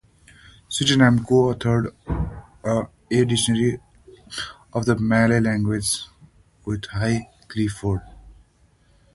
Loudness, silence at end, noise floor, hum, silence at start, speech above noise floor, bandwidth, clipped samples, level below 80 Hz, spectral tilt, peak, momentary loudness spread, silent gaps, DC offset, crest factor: -22 LUFS; 0.8 s; -58 dBFS; none; 0.7 s; 38 dB; 12 kHz; under 0.1%; -42 dBFS; -5 dB/octave; -2 dBFS; 15 LU; none; under 0.1%; 20 dB